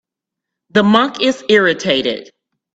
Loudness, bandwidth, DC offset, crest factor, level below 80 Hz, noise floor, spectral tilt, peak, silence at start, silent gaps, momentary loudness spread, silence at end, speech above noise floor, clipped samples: -14 LUFS; 8 kHz; under 0.1%; 16 dB; -58 dBFS; -82 dBFS; -4.5 dB/octave; 0 dBFS; 0.75 s; none; 7 LU; 0.5 s; 68 dB; under 0.1%